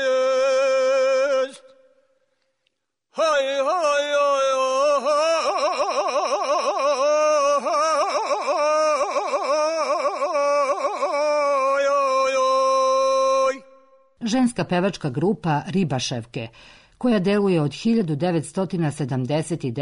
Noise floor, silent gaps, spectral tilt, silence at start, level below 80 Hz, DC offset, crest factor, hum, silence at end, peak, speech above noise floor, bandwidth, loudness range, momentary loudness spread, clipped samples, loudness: -74 dBFS; none; -5 dB/octave; 0 s; -60 dBFS; under 0.1%; 10 dB; none; 0 s; -12 dBFS; 52 dB; 11 kHz; 3 LU; 6 LU; under 0.1%; -21 LUFS